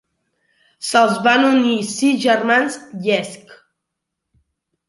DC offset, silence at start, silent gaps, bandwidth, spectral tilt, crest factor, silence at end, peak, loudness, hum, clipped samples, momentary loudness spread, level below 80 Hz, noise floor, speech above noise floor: under 0.1%; 0.8 s; none; 11.5 kHz; -3.5 dB/octave; 18 dB; 1.35 s; -2 dBFS; -16 LUFS; none; under 0.1%; 11 LU; -68 dBFS; -79 dBFS; 63 dB